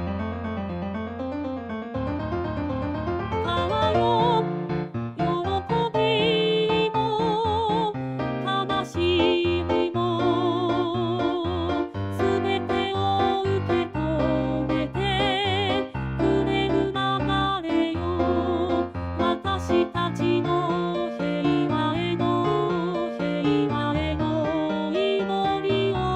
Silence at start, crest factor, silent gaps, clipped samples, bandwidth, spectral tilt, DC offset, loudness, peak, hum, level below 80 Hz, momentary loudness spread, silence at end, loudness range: 0 s; 16 dB; none; under 0.1%; 9.6 kHz; -7 dB/octave; under 0.1%; -24 LUFS; -8 dBFS; none; -44 dBFS; 7 LU; 0 s; 2 LU